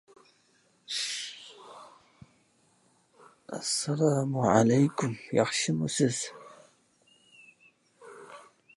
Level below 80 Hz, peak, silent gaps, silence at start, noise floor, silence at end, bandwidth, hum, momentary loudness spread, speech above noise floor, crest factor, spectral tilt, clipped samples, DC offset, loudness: -70 dBFS; -8 dBFS; none; 0.9 s; -67 dBFS; 0.35 s; 11.5 kHz; none; 26 LU; 40 dB; 24 dB; -4.5 dB/octave; under 0.1%; under 0.1%; -28 LUFS